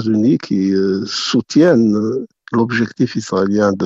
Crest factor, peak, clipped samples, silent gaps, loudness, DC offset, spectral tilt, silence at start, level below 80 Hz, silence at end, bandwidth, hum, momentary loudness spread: 12 dB; -2 dBFS; under 0.1%; none; -16 LUFS; under 0.1%; -6 dB/octave; 0 s; -56 dBFS; 0 s; 8 kHz; none; 7 LU